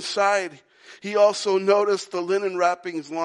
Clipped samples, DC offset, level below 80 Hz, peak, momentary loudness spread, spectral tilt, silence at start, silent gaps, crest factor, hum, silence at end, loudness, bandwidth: under 0.1%; under 0.1%; -84 dBFS; -6 dBFS; 11 LU; -3.5 dB/octave; 0 s; none; 16 dB; none; 0 s; -22 LUFS; 11.5 kHz